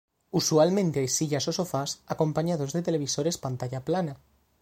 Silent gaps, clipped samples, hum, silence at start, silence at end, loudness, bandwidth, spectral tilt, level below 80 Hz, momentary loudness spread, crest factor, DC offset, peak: none; under 0.1%; none; 0.35 s; 0.45 s; -27 LUFS; 16.5 kHz; -5 dB/octave; -62 dBFS; 10 LU; 18 dB; under 0.1%; -10 dBFS